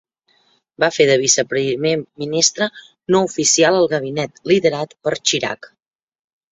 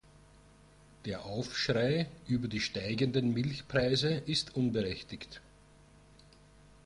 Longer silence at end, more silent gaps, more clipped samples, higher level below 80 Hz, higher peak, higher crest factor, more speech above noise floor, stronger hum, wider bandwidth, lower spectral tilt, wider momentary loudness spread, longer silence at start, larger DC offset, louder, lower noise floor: second, 0.85 s vs 1.45 s; neither; neither; about the same, -60 dBFS vs -58 dBFS; first, 0 dBFS vs -16 dBFS; about the same, 18 dB vs 18 dB; first, 43 dB vs 27 dB; second, none vs 50 Hz at -60 dBFS; second, 8.4 kHz vs 11.5 kHz; second, -2.5 dB/octave vs -5.5 dB/octave; second, 10 LU vs 14 LU; second, 0.8 s vs 1.05 s; neither; first, -17 LUFS vs -33 LUFS; about the same, -60 dBFS vs -59 dBFS